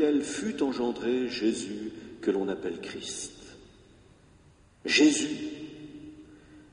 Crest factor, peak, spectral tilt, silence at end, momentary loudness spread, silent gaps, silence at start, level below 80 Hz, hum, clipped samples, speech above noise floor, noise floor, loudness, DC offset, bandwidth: 20 dB; -10 dBFS; -3 dB/octave; 0.1 s; 22 LU; none; 0 s; -62 dBFS; none; under 0.1%; 30 dB; -58 dBFS; -29 LUFS; under 0.1%; 11 kHz